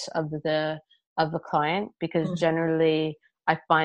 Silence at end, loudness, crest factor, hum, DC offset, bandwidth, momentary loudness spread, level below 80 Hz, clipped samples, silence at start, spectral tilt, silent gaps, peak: 0 s; -27 LUFS; 20 dB; none; under 0.1%; 10 kHz; 8 LU; -64 dBFS; under 0.1%; 0 s; -6 dB/octave; 1.07-1.16 s; -6 dBFS